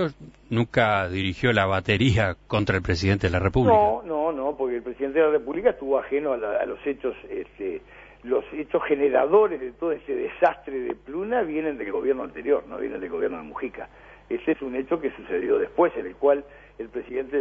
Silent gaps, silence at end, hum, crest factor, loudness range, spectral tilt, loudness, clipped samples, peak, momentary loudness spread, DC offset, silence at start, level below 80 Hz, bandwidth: none; 0 s; 50 Hz at -50 dBFS; 20 dB; 6 LU; -7 dB/octave; -25 LUFS; under 0.1%; -4 dBFS; 12 LU; under 0.1%; 0 s; -48 dBFS; 8 kHz